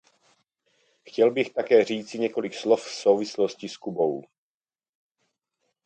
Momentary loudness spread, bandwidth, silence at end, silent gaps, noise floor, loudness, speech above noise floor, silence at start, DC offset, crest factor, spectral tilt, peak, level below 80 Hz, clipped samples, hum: 11 LU; 8.8 kHz; 1.65 s; none; under -90 dBFS; -25 LUFS; over 66 dB; 1.05 s; under 0.1%; 20 dB; -4.5 dB/octave; -6 dBFS; -78 dBFS; under 0.1%; none